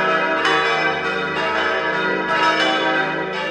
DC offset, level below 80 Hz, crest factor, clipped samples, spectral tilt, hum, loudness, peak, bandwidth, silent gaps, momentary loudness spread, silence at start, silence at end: under 0.1%; -54 dBFS; 14 dB; under 0.1%; -3.5 dB/octave; none; -18 LUFS; -4 dBFS; 11 kHz; none; 5 LU; 0 s; 0 s